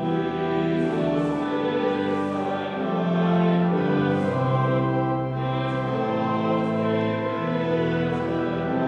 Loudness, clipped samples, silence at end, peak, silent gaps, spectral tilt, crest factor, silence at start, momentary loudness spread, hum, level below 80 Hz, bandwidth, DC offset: -24 LUFS; under 0.1%; 0 s; -10 dBFS; none; -8.5 dB/octave; 14 dB; 0 s; 4 LU; none; -56 dBFS; 7.4 kHz; under 0.1%